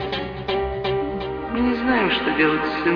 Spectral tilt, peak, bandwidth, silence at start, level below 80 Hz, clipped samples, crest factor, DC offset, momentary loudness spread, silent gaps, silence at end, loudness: -7.5 dB/octave; -6 dBFS; 5.4 kHz; 0 s; -40 dBFS; under 0.1%; 16 dB; under 0.1%; 8 LU; none; 0 s; -22 LUFS